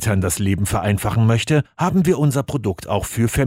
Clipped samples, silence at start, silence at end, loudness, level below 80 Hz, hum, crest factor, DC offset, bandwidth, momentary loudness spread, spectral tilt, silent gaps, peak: under 0.1%; 0 s; 0 s; -19 LUFS; -38 dBFS; none; 14 dB; under 0.1%; 16 kHz; 6 LU; -6 dB/octave; none; -4 dBFS